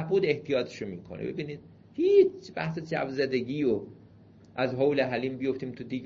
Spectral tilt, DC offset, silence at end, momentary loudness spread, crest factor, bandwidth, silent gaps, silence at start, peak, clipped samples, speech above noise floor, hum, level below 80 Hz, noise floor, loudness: -7 dB/octave; under 0.1%; 0 s; 16 LU; 18 dB; 7.2 kHz; none; 0 s; -10 dBFS; under 0.1%; 26 dB; none; -64 dBFS; -54 dBFS; -29 LUFS